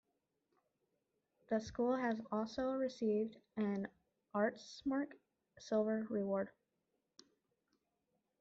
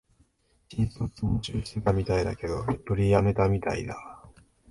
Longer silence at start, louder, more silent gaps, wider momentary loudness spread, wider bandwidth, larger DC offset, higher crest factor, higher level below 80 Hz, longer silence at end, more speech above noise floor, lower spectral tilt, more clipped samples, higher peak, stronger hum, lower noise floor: first, 1.5 s vs 0.7 s; second, -40 LUFS vs -28 LUFS; neither; second, 8 LU vs 13 LU; second, 7.8 kHz vs 11.5 kHz; neither; about the same, 18 dB vs 20 dB; second, -76 dBFS vs -42 dBFS; first, 1.9 s vs 0.4 s; first, 47 dB vs 39 dB; second, -5.5 dB/octave vs -7.5 dB/octave; neither; second, -24 dBFS vs -6 dBFS; neither; first, -86 dBFS vs -66 dBFS